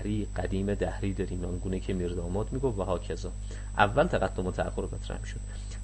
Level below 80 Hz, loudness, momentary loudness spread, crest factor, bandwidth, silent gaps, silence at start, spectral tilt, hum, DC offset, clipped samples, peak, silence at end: -38 dBFS; -31 LUFS; 12 LU; 22 dB; 8.6 kHz; none; 0 s; -6.5 dB/octave; 50 Hz at -35 dBFS; under 0.1%; under 0.1%; -8 dBFS; 0 s